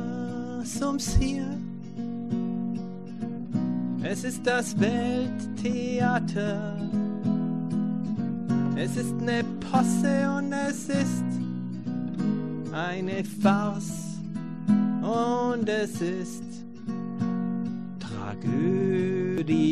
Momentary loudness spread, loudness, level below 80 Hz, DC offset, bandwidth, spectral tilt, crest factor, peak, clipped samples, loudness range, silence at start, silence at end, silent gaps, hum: 10 LU; -28 LUFS; -44 dBFS; 0.5%; 13 kHz; -6 dB/octave; 18 dB; -8 dBFS; under 0.1%; 4 LU; 0 s; 0 s; none; none